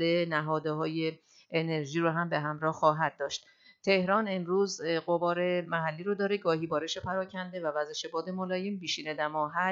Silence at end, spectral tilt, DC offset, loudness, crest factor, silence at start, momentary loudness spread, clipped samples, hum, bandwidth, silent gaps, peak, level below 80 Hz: 0 s; -5 dB/octave; under 0.1%; -31 LUFS; 20 dB; 0 s; 7 LU; under 0.1%; none; 7.8 kHz; none; -10 dBFS; -74 dBFS